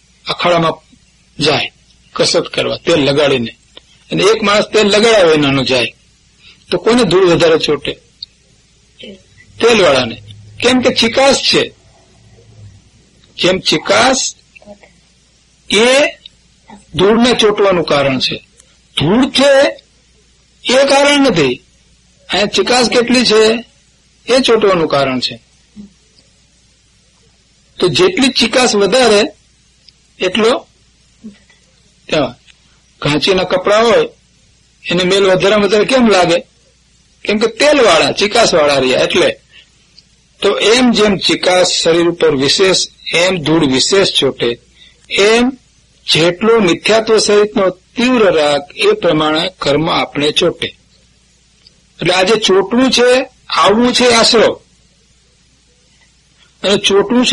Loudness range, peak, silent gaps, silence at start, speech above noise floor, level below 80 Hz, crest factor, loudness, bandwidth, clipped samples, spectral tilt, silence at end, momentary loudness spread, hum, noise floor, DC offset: 5 LU; 0 dBFS; none; 0.25 s; 40 dB; -44 dBFS; 12 dB; -11 LUFS; 11.5 kHz; under 0.1%; -3.5 dB/octave; 0 s; 10 LU; none; -51 dBFS; under 0.1%